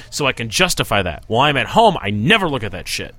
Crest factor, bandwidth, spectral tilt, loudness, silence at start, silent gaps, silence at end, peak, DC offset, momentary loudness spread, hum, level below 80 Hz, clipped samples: 18 dB; 16.5 kHz; -4 dB/octave; -16 LUFS; 0 s; none; 0.05 s; 0 dBFS; under 0.1%; 8 LU; none; -38 dBFS; under 0.1%